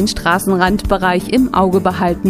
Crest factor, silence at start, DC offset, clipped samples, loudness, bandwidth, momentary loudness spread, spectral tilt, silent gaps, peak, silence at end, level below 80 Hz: 14 dB; 0 s; under 0.1%; under 0.1%; -14 LUFS; 15.5 kHz; 2 LU; -5.5 dB/octave; none; 0 dBFS; 0 s; -30 dBFS